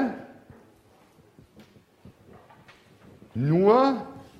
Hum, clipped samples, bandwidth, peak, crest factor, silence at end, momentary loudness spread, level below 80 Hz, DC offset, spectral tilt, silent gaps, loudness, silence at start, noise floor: none; under 0.1%; 8 kHz; -6 dBFS; 22 dB; 0.15 s; 22 LU; -64 dBFS; under 0.1%; -9 dB/octave; none; -22 LUFS; 0 s; -58 dBFS